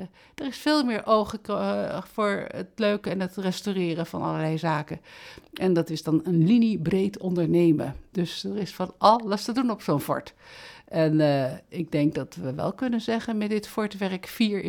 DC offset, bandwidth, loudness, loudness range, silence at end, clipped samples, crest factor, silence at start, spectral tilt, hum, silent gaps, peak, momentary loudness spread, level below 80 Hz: under 0.1%; 19 kHz; -26 LUFS; 4 LU; 0 s; under 0.1%; 22 dB; 0 s; -6.5 dB/octave; none; none; -4 dBFS; 12 LU; -58 dBFS